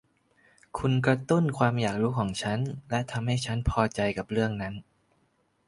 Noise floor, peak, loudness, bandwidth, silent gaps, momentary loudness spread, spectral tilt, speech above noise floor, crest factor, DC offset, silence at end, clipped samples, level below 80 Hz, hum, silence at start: -70 dBFS; -8 dBFS; -28 LUFS; 11.5 kHz; none; 7 LU; -6.5 dB/octave; 43 dB; 20 dB; under 0.1%; 0.85 s; under 0.1%; -46 dBFS; none; 0.75 s